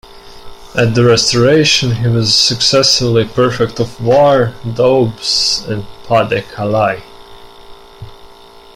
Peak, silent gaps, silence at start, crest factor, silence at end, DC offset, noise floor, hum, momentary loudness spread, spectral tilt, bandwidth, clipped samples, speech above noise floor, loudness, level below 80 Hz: 0 dBFS; none; 0.1 s; 14 dB; 0.15 s; under 0.1%; -38 dBFS; none; 8 LU; -4 dB/octave; 15.5 kHz; under 0.1%; 26 dB; -11 LUFS; -40 dBFS